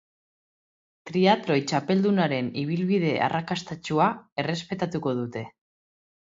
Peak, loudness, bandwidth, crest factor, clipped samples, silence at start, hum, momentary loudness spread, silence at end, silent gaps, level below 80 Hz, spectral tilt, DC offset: -6 dBFS; -25 LUFS; 7.8 kHz; 22 dB; under 0.1%; 1.05 s; none; 9 LU; 0.85 s; 4.32-4.36 s; -66 dBFS; -6 dB/octave; under 0.1%